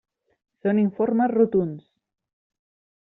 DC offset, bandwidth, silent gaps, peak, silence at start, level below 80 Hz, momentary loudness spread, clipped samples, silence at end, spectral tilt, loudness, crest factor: under 0.1%; 3.9 kHz; none; -8 dBFS; 0.65 s; -66 dBFS; 11 LU; under 0.1%; 1.2 s; -9 dB/octave; -22 LUFS; 18 dB